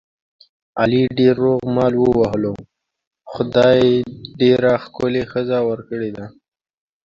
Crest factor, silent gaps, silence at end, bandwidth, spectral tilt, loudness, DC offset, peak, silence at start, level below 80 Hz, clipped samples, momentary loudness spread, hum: 16 dB; 3.07-3.11 s; 0.75 s; 7.2 kHz; -7.5 dB/octave; -17 LUFS; under 0.1%; -2 dBFS; 0.75 s; -48 dBFS; under 0.1%; 15 LU; none